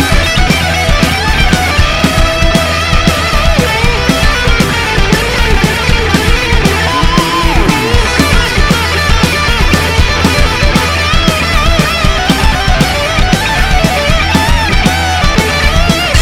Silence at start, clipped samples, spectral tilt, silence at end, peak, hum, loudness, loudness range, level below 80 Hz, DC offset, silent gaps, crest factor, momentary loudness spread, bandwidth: 0 s; 0.8%; -4 dB/octave; 0 s; 0 dBFS; none; -10 LUFS; 0 LU; -14 dBFS; under 0.1%; none; 8 dB; 1 LU; 16.5 kHz